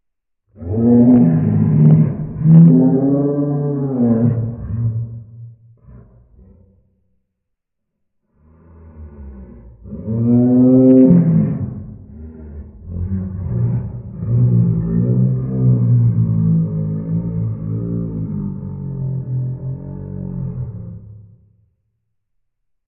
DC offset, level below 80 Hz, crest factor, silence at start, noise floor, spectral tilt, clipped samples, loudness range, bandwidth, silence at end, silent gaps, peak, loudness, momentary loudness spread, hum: under 0.1%; -40 dBFS; 16 dB; 0.6 s; -76 dBFS; -15 dB/octave; under 0.1%; 14 LU; 2.4 kHz; 1.65 s; none; 0 dBFS; -15 LUFS; 23 LU; none